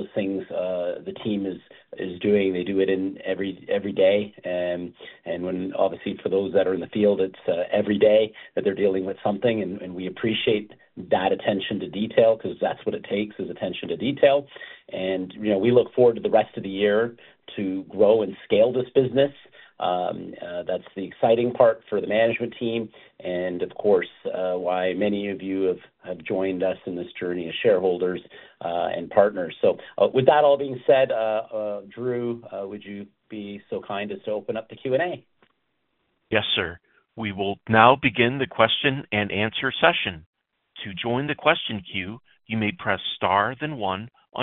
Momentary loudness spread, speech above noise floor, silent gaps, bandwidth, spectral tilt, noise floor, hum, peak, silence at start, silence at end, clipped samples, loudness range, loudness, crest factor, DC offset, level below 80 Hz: 13 LU; 51 dB; 40.26-40.33 s; 4.2 kHz; -3.5 dB/octave; -74 dBFS; none; 0 dBFS; 0 s; 0 s; under 0.1%; 5 LU; -24 LUFS; 24 dB; under 0.1%; -62 dBFS